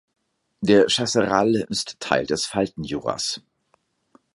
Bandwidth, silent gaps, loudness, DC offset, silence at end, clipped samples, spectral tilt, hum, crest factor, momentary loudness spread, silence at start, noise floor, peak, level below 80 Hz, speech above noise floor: 11.5 kHz; none; -22 LUFS; under 0.1%; 0.95 s; under 0.1%; -4 dB/octave; none; 22 dB; 10 LU; 0.6 s; -67 dBFS; -2 dBFS; -56 dBFS; 45 dB